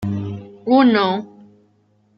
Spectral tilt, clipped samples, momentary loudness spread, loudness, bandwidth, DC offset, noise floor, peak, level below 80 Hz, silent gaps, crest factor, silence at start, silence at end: -8 dB/octave; under 0.1%; 16 LU; -17 LUFS; 6 kHz; under 0.1%; -59 dBFS; -2 dBFS; -60 dBFS; none; 16 dB; 0 s; 0.9 s